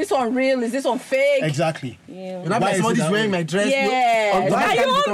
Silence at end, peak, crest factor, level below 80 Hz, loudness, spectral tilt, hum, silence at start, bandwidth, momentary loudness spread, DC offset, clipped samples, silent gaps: 0 s; -10 dBFS; 10 dB; -58 dBFS; -19 LUFS; -5 dB/octave; none; 0 s; 15.5 kHz; 8 LU; under 0.1%; under 0.1%; none